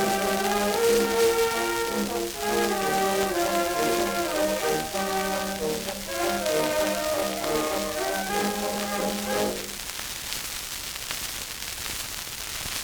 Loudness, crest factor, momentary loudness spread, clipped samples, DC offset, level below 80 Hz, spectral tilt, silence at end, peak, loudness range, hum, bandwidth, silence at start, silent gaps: -26 LUFS; 20 dB; 9 LU; under 0.1%; under 0.1%; -50 dBFS; -2.5 dB/octave; 0 s; -6 dBFS; 5 LU; none; over 20 kHz; 0 s; none